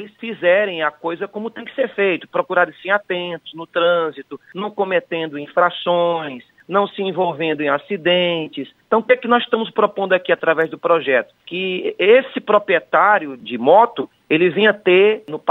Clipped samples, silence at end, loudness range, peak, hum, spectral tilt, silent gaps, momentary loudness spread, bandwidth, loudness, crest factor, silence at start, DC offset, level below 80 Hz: under 0.1%; 0 s; 5 LU; -2 dBFS; none; -7.5 dB/octave; none; 14 LU; 4.1 kHz; -18 LUFS; 16 dB; 0 s; under 0.1%; -72 dBFS